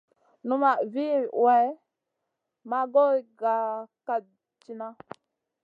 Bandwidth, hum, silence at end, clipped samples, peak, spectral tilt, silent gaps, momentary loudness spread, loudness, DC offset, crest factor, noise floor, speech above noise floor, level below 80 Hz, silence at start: 5.2 kHz; none; 0.7 s; under 0.1%; -10 dBFS; -7 dB/octave; none; 18 LU; -25 LUFS; under 0.1%; 18 dB; -83 dBFS; 57 dB; -86 dBFS; 0.45 s